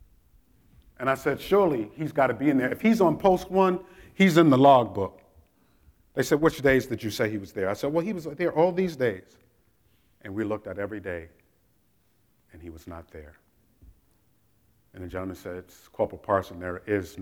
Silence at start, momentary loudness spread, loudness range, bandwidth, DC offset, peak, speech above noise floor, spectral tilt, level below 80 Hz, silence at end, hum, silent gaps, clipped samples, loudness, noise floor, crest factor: 1 s; 21 LU; 19 LU; 18 kHz; under 0.1%; -6 dBFS; 43 dB; -6.5 dB/octave; -56 dBFS; 0 s; none; none; under 0.1%; -25 LUFS; -68 dBFS; 22 dB